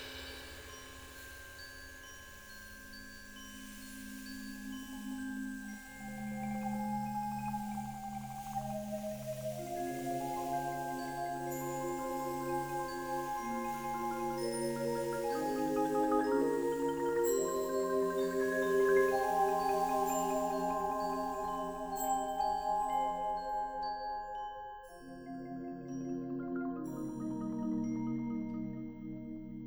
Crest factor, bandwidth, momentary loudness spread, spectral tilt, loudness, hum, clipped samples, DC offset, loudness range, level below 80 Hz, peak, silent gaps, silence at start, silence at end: 18 dB; over 20 kHz; 16 LU; -5 dB/octave; -36 LUFS; none; under 0.1%; under 0.1%; 13 LU; -60 dBFS; -18 dBFS; none; 0 s; 0 s